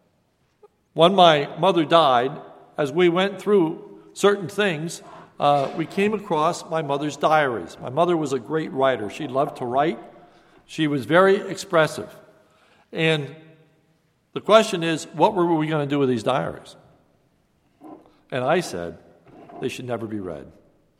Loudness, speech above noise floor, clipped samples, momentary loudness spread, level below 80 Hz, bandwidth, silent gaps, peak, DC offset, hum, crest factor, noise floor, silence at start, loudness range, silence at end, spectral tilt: -21 LUFS; 45 dB; under 0.1%; 17 LU; -64 dBFS; 14.5 kHz; none; 0 dBFS; under 0.1%; none; 22 dB; -66 dBFS; 0.95 s; 9 LU; 0.55 s; -5.5 dB/octave